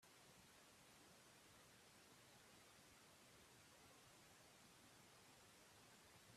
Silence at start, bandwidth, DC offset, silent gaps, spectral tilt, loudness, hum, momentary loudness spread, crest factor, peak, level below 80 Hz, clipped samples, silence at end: 0 s; 14.5 kHz; under 0.1%; none; -2.5 dB/octave; -67 LUFS; none; 0 LU; 14 dB; -54 dBFS; -88 dBFS; under 0.1%; 0 s